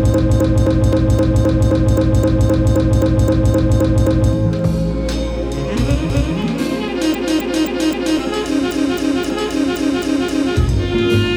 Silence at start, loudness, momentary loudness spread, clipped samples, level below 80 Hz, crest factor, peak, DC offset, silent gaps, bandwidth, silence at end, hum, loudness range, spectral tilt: 0 s; -16 LUFS; 5 LU; under 0.1%; -22 dBFS; 12 dB; -2 dBFS; under 0.1%; none; over 20 kHz; 0 s; none; 4 LU; -7 dB/octave